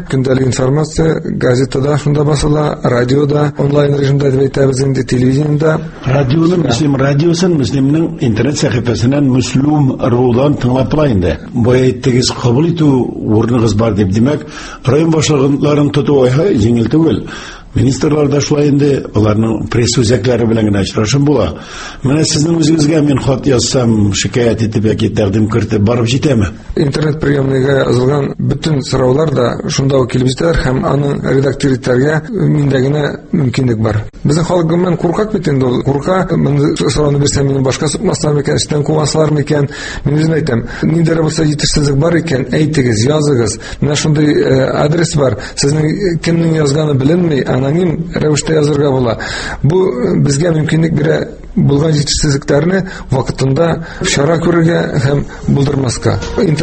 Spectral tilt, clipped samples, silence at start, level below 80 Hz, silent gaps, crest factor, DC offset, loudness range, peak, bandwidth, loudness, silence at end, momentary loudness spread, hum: -6 dB/octave; under 0.1%; 0 s; -30 dBFS; none; 12 dB; under 0.1%; 1 LU; 0 dBFS; 8.8 kHz; -12 LUFS; 0 s; 4 LU; none